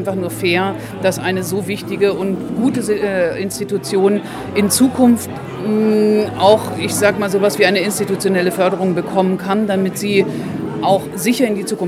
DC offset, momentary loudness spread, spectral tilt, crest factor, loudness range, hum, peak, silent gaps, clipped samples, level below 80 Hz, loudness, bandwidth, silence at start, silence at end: under 0.1%; 8 LU; -5 dB/octave; 16 dB; 3 LU; none; 0 dBFS; none; under 0.1%; -52 dBFS; -16 LUFS; 16 kHz; 0 s; 0 s